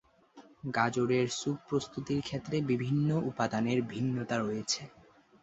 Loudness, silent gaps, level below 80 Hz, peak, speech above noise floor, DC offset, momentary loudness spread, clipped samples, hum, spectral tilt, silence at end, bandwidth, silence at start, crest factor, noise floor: -32 LUFS; none; -66 dBFS; -14 dBFS; 26 dB; under 0.1%; 6 LU; under 0.1%; none; -5.5 dB/octave; 0.55 s; 8.2 kHz; 0.35 s; 20 dB; -58 dBFS